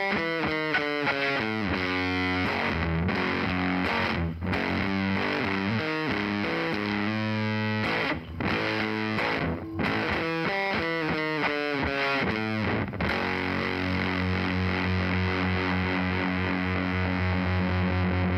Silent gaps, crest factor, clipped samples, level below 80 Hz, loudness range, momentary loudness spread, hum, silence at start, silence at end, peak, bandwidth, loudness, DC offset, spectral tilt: none; 14 dB; under 0.1%; -46 dBFS; 1 LU; 2 LU; none; 0 s; 0 s; -14 dBFS; 12.5 kHz; -27 LUFS; under 0.1%; -7 dB/octave